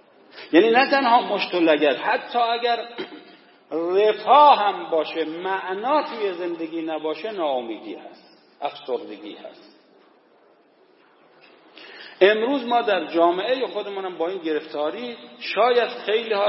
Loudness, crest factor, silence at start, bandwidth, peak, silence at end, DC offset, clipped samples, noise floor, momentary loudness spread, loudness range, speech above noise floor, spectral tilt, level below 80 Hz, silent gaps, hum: -21 LUFS; 20 dB; 0.35 s; 5.8 kHz; -2 dBFS; 0 s; under 0.1%; under 0.1%; -57 dBFS; 18 LU; 15 LU; 36 dB; -7.5 dB/octave; -86 dBFS; none; none